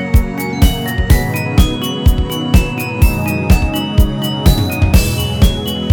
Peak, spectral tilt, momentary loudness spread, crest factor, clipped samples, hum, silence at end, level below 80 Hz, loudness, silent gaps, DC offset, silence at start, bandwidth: 0 dBFS; -5.5 dB/octave; 4 LU; 12 dB; under 0.1%; none; 0 s; -16 dBFS; -14 LUFS; none; under 0.1%; 0 s; 19.5 kHz